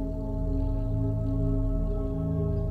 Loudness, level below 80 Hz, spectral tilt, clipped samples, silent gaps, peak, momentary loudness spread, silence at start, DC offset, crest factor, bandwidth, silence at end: -30 LUFS; -30 dBFS; -11.5 dB/octave; under 0.1%; none; -16 dBFS; 3 LU; 0 s; under 0.1%; 10 dB; 1.8 kHz; 0 s